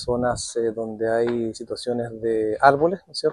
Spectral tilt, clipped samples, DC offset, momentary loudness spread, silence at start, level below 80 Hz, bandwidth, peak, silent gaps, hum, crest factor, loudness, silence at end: -5 dB/octave; under 0.1%; under 0.1%; 10 LU; 0 s; -50 dBFS; 11.5 kHz; 0 dBFS; none; none; 22 dB; -23 LUFS; 0 s